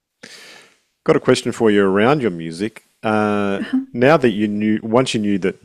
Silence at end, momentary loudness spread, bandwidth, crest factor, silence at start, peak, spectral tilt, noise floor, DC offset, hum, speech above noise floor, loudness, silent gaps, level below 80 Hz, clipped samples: 0.15 s; 11 LU; 13 kHz; 18 dB; 0.3 s; 0 dBFS; -6 dB/octave; -50 dBFS; under 0.1%; none; 33 dB; -17 LUFS; none; -54 dBFS; under 0.1%